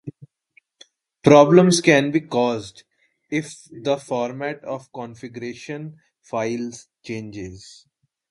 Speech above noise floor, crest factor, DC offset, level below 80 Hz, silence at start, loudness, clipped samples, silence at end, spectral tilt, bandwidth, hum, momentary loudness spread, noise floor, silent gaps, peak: 40 dB; 22 dB; under 0.1%; -58 dBFS; 0.05 s; -19 LUFS; under 0.1%; 0.7 s; -5.5 dB/octave; 11.5 kHz; none; 23 LU; -61 dBFS; none; 0 dBFS